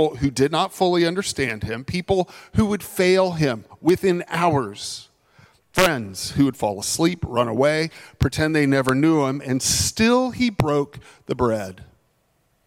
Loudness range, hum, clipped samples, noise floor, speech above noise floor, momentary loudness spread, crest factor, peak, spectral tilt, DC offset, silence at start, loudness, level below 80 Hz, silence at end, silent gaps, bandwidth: 3 LU; none; under 0.1%; -65 dBFS; 45 dB; 9 LU; 16 dB; -6 dBFS; -4.5 dB/octave; under 0.1%; 0 s; -21 LUFS; -46 dBFS; 0.85 s; none; 16.5 kHz